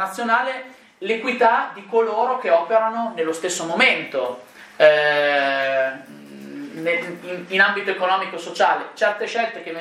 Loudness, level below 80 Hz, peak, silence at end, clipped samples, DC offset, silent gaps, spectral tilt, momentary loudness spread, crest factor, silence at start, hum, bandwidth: -20 LUFS; -76 dBFS; 0 dBFS; 0 s; under 0.1%; under 0.1%; none; -3 dB/octave; 14 LU; 20 dB; 0 s; none; 14.5 kHz